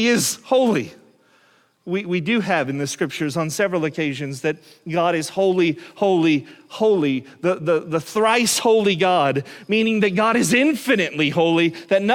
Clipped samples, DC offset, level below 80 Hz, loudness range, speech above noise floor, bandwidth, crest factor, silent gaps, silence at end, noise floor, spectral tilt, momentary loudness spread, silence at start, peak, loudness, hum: under 0.1%; under 0.1%; -64 dBFS; 5 LU; 38 dB; 17.5 kHz; 16 dB; none; 0 s; -58 dBFS; -4.5 dB/octave; 8 LU; 0 s; -4 dBFS; -20 LUFS; none